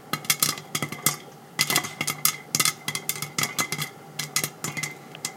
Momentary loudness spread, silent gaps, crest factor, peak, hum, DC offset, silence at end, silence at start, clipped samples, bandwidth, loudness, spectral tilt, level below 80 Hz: 10 LU; none; 28 dB; 0 dBFS; none; under 0.1%; 0 s; 0 s; under 0.1%; 17 kHz; -26 LUFS; -1 dB/octave; -72 dBFS